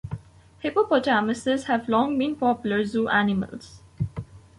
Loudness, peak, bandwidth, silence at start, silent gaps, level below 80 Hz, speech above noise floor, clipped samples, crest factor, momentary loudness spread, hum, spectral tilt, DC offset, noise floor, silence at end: -24 LUFS; -8 dBFS; 11.5 kHz; 0.05 s; none; -52 dBFS; 21 dB; under 0.1%; 16 dB; 14 LU; none; -6 dB/octave; under 0.1%; -44 dBFS; 0.2 s